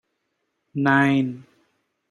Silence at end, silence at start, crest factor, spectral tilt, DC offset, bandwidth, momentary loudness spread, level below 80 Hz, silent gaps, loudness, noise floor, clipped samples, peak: 0.7 s; 0.75 s; 20 dB; -7.5 dB/octave; under 0.1%; 9.8 kHz; 17 LU; -68 dBFS; none; -20 LUFS; -75 dBFS; under 0.1%; -6 dBFS